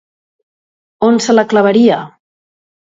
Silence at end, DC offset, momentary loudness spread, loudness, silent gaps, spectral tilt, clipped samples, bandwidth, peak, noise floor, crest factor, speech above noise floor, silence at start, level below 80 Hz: 0.85 s; under 0.1%; 6 LU; -11 LUFS; none; -5 dB/octave; under 0.1%; 7.8 kHz; 0 dBFS; under -90 dBFS; 14 dB; over 80 dB; 1 s; -58 dBFS